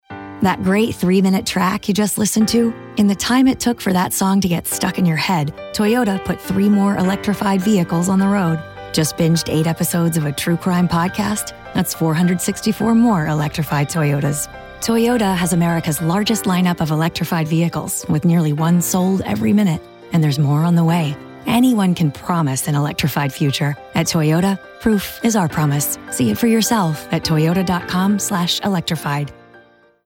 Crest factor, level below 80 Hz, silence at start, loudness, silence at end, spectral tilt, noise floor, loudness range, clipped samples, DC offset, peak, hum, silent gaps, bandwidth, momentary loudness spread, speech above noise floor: 14 dB; -46 dBFS; 0.1 s; -17 LUFS; 0.5 s; -5.5 dB/octave; -49 dBFS; 2 LU; under 0.1%; under 0.1%; -4 dBFS; none; none; 17 kHz; 6 LU; 32 dB